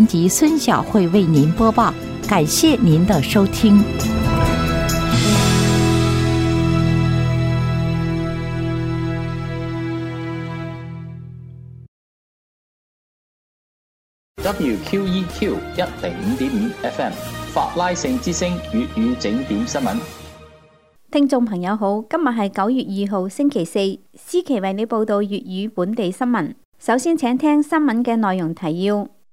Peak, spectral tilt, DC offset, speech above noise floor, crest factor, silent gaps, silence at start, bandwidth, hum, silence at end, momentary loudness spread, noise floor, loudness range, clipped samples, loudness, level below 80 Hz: -2 dBFS; -5.5 dB/octave; under 0.1%; 34 dB; 16 dB; 11.88-14.35 s, 26.65-26.72 s; 0 s; 16 kHz; none; 0.25 s; 11 LU; -51 dBFS; 11 LU; under 0.1%; -19 LUFS; -36 dBFS